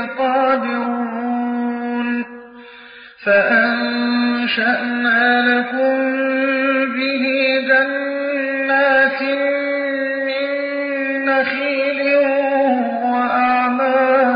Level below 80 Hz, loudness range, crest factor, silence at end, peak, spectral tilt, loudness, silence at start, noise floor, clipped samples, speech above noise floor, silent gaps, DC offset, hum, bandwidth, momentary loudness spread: -66 dBFS; 3 LU; 14 dB; 0 s; -2 dBFS; -9 dB/octave; -17 LUFS; 0 s; -40 dBFS; under 0.1%; 24 dB; none; under 0.1%; none; 5.2 kHz; 8 LU